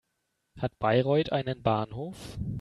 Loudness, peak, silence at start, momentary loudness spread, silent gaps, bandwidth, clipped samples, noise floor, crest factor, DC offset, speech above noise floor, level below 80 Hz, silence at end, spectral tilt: -29 LUFS; -10 dBFS; 0.55 s; 13 LU; none; 12.5 kHz; under 0.1%; -79 dBFS; 20 dB; under 0.1%; 51 dB; -52 dBFS; 0 s; -7.5 dB/octave